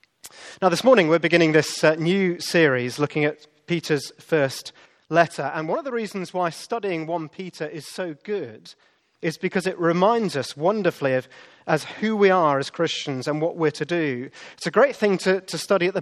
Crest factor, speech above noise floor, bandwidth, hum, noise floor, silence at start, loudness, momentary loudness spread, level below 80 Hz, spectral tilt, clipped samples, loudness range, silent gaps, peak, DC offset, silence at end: 22 dB; 22 dB; 13.5 kHz; none; -45 dBFS; 0.25 s; -22 LUFS; 14 LU; -72 dBFS; -5 dB/octave; under 0.1%; 9 LU; none; -2 dBFS; under 0.1%; 0 s